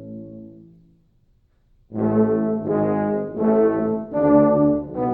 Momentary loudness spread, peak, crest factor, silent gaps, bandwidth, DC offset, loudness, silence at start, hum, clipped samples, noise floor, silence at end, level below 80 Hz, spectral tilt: 20 LU; -4 dBFS; 16 dB; none; 3 kHz; under 0.1%; -20 LUFS; 0 s; none; under 0.1%; -60 dBFS; 0 s; -50 dBFS; -12.5 dB/octave